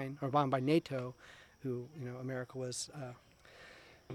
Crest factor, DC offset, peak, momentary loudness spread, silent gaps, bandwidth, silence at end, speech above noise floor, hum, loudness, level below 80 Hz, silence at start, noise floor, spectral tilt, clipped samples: 22 dB; under 0.1%; -16 dBFS; 24 LU; none; 15 kHz; 0 s; 21 dB; none; -38 LUFS; -72 dBFS; 0 s; -58 dBFS; -5.5 dB/octave; under 0.1%